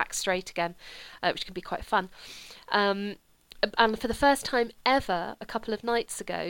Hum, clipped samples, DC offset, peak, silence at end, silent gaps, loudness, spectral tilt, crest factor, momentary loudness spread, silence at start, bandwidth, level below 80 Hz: none; under 0.1%; under 0.1%; -6 dBFS; 0 s; none; -28 LUFS; -3 dB/octave; 22 dB; 18 LU; 0 s; 18.5 kHz; -52 dBFS